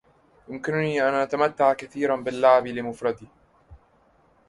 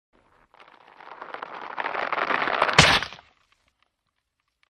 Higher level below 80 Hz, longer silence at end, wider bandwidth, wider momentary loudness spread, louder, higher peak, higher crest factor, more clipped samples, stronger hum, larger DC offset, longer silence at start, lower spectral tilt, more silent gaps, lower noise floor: second, -60 dBFS vs -50 dBFS; second, 0.75 s vs 1.55 s; second, 11.5 kHz vs 15.5 kHz; second, 13 LU vs 21 LU; about the same, -23 LUFS vs -21 LUFS; second, -4 dBFS vs 0 dBFS; second, 20 dB vs 26 dB; neither; neither; neither; second, 0.5 s vs 1.05 s; first, -6 dB/octave vs -2.5 dB/octave; neither; second, -61 dBFS vs -78 dBFS